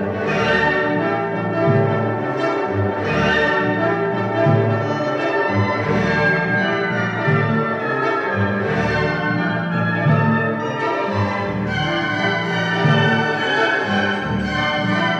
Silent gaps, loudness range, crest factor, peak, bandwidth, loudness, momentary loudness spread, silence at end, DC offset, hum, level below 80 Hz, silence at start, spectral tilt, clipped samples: none; 1 LU; 14 dB; -4 dBFS; 8.4 kHz; -18 LUFS; 4 LU; 0 s; under 0.1%; none; -44 dBFS; 0 s; -7 dB/octave; under 0.1%